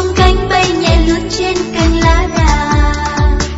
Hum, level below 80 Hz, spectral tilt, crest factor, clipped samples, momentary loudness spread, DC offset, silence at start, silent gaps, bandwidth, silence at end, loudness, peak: none; -16 dBFS; -5 dB/octave; 10 dB; 0.1%; 4 LU; under 0.1%; 0 s; none; 8 kHz; 0 s; -12 LUFS; 0 dBFS